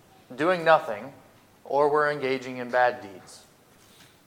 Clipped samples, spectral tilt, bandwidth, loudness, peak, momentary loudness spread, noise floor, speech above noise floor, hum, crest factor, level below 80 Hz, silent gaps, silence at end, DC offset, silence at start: under 0.1%; -5 dB/octave; 16.5 kHz; -24 LUFS; -6 dBFS; 22 LU; -56 dBFS; 31 dB; none; 22 dB; -74 dBFS; none; 0.9 s; under 0.1%; 0.3 s